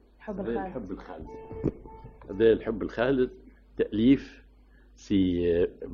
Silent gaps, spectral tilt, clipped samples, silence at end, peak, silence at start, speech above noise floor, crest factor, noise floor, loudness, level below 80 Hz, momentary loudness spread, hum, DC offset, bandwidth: none; -8 dB/octave; under 0.1%; 0 s; -10 dBFS; 0.2 s; 29 dB; 18 dB; -56 dBFS; -27 LUFS; -48 dBFS; 19 LU; none; under 0.1%; 7.2 kHz